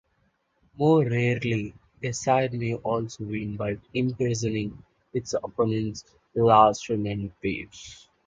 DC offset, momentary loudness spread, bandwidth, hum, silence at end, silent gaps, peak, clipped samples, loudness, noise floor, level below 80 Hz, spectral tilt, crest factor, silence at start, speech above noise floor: under 0.1%; 14 LU; 9.2 kHz; none; 0.3 s; none; -4 dBFS; under 0.1%; -26 LUFS; -70 dBFS; -54 dBFS; -6 dB/octave; 22 dB; 0.8 s; 45 dB